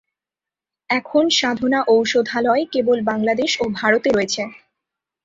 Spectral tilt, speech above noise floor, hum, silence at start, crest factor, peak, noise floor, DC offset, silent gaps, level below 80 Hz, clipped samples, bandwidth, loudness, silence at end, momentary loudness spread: -3.5 dB/octave; 71 dB; none; 0.9 s; 18 dB; -2 dBFS; -89 dBFS; under 0.1%; none; -58 dBFS; under 0.1%; 7.8 kHz; -18 LUFS; 0.7 s; 6 LU